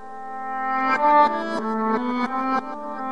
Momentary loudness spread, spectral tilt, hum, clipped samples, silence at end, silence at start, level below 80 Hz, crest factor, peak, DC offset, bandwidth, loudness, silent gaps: 14 LU; -5.5 dB/octave; none; under 0.1%; 0 s; 0 s; -72 dBFS; 16 dB; -6 dBFS; 1%; 10.5 kHz; -22 LUFS; none